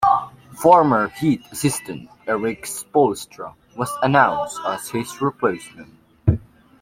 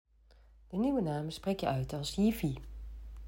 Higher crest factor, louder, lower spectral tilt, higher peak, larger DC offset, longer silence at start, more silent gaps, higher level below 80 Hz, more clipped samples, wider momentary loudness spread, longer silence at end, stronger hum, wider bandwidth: about the same, 18 dB vs 16 dB; first, -20 LUFS vs -34 LUFS; about the same, -5.5 dB/octave vs -6.5 dB/octave; first, -2 dBFS vs -18 dBFS; neither; second, 0 s vs 0.7 s; neither; about the same, -46 dBFS vs -50 dBFS; neither; about the same, 18 LU vs 16 LU; first, 0.45 s vs 0 s; neither; about the same, 16.5 kHz vs 16 kHz